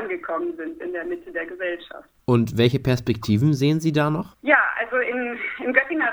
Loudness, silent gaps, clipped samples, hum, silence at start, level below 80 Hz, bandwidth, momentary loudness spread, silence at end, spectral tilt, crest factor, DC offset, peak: -22 LUFS; none; under 0.1%; none; 0 s; -54 dBFS; over 20 kHz; 12 LU; 0 s; -6.5 dB/octave; 20 dB; under 0.1%; -2 dBFS